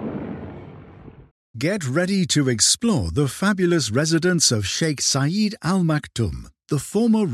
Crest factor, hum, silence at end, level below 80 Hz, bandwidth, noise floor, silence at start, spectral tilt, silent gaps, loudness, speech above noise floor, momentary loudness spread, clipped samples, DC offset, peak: 18 dB; none; 0 s; -48 dBFS; 15 kHz; -43 dBFS; 0 s; -4 dB/octave; 1.31-1.54 s; -20 LUFS; 23 dB; 13 LU; under 0.1%; under 0.1%; -4 dBFS